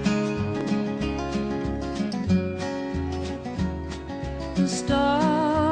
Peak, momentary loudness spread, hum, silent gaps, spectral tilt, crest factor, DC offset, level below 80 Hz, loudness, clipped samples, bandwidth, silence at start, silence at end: -10 dBFS; 9 LU; none; none; -6 dB/octave; 16 dB; under 0.1%; -40 dBFS; -26 LUFS; under 0.1%; 10 kHz; 0 s; 0 s